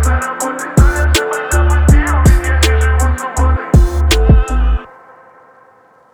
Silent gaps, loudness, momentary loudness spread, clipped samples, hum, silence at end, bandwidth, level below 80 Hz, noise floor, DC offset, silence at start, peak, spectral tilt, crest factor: none; -13 LUFS; 6 LU; under 0.1%; none; 1.3 s; 18.5 kHz; -14 dBFS; -47 dBFS; under 0.1%; 0 s; 0 dBFS; -5 dB/octave; 12 dB